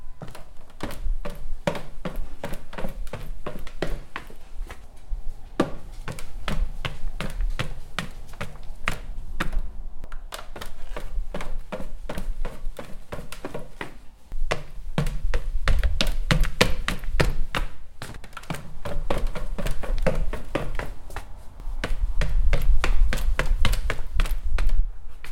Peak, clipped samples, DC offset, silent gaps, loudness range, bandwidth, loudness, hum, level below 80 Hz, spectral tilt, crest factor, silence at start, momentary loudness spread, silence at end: 0 dBFS; under 0.1%; under 0.1%; none; 10 LU; 13 kHz; -31 LUFS; none; -26 dBFS; -5 dB/octave; 22 dB; 0 s; 14 LU; 0 s